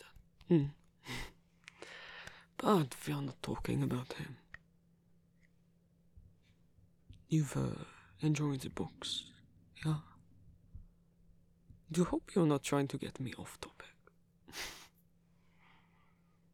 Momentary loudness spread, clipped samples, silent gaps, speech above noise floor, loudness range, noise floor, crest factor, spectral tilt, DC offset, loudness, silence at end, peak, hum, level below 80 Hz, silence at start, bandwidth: 23 LU; under 0.1%; none; 34 dB; 8 LU; -70 dBFS; 24 dB; -6 dB/octave; under 0.1%; -37 LUFS; 1.7 s; -16 dBFS; none; -62 dBFS; 0 s; 16.5 kHz